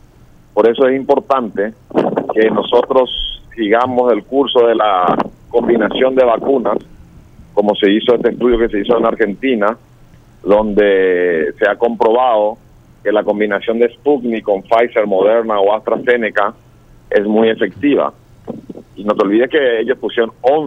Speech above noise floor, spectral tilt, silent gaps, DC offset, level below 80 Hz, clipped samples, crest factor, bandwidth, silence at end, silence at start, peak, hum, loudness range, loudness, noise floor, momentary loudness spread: 31 dB; -7 dB/octave; none; under 0.1%; -40 dBFS; under 0.1%; 14 dB; 6 kHz; 0 s; 0.55 s; 0 dBFS; none; 2 LU; -14 LUFS; -44 dBFS; 9 LU